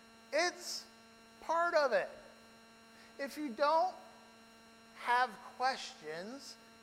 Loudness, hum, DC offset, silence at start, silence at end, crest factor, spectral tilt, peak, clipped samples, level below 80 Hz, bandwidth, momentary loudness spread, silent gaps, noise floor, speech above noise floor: -36 LUFS; none; under 0.1%; 0.3 s; 0.3 s; 20 dB; -2 dB/octave; -18 dBFS; under 0.1%; -80 dBFS; 16.5 kHz; 23 LU; none; -60 dBFS; 24 dB